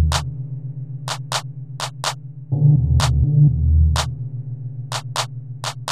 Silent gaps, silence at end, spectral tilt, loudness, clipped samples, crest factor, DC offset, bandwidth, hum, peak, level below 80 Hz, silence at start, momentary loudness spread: none; 0 s; -5.5 dB/octave; -21 LUFS; under 0.1%; 14 dB; 0.7%; 14 kHz; none; -4 dBFS; -26 dBFS; 0 s; 15 LU